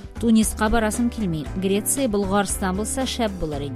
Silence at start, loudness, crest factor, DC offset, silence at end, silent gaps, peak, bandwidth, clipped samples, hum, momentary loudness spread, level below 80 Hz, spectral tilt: 0 s; -22 LUFS; 16 dB; under 0.1%; 0 s; none; -6 dBFS; 15.5 kHz; under 0.1%; none; 7 LU; -34 dBFS; -4.5 dB/octave